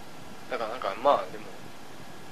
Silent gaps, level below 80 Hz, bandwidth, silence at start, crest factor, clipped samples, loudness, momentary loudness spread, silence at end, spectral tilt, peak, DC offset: none; -66 dBFS; 14 kHz; 0 s; 24 dB; under 0.1%; -29 LUFS; 20 LU; 0 s; -4 dB/octave; -8 dBFS; 1%